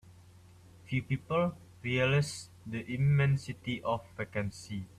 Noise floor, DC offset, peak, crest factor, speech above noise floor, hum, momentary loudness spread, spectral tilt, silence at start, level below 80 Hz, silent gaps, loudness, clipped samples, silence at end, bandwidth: -56 dBFS; under 0.1%; -16 dBFS; 16 dB; 25 dB; none; 13 LU; -6.5 dB/octave; 0.1 s; -60 dBFS; none; -33 LUFS; under 0.1%; 0.15 s; 11.5 kHz